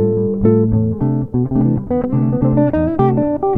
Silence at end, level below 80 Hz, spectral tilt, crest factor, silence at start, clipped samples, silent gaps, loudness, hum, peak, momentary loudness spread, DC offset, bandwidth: 0 s; -34 dBFS; -13 dB/octave; 14 dB; 0 s; under 0.1%; none; -16 LUFS; none; 0 dBFS; 4 LU; 1%; 3.6 kHz